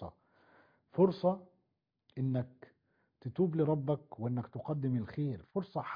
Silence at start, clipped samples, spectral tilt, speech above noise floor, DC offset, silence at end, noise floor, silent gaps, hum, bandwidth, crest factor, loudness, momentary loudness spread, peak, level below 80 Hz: 0 s; under 0.1%; -9 dB/octave; 48 dB; under 0.1%; 0 s; -82 dBFS; none; none; 5.2 kHz; 20 dB; -35 LUFS; 13 LU; -16 dBFS; -70 dBFS